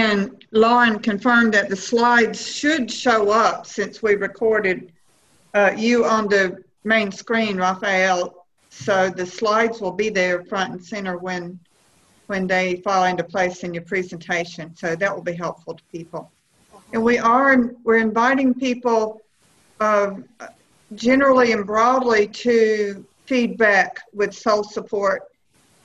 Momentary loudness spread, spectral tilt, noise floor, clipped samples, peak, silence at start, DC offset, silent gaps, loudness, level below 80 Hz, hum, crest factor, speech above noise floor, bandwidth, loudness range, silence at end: 12 LU; -4.5 dB/octave; -59 dBFS; under 0.1%; -4 dBFS; 0 s; under 0.1%; none; -19 LUFS; -58 dBFS; none; 16 dB; 40 dB; 9 kHz; 6 LU; 0.6 s